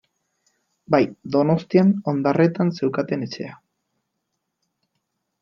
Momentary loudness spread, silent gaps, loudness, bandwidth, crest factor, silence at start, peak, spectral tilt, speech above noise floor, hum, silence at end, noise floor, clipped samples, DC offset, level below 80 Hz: 10 LU; none; -21 LUFS; 6.8 kHz; 20 dB; 0.9 s; -2 dBFS; -8.5 dB/octave; 58 dB; none; 1.9 s; -78 dBFS; under 0.1%; under 0.1%; -66 dBFS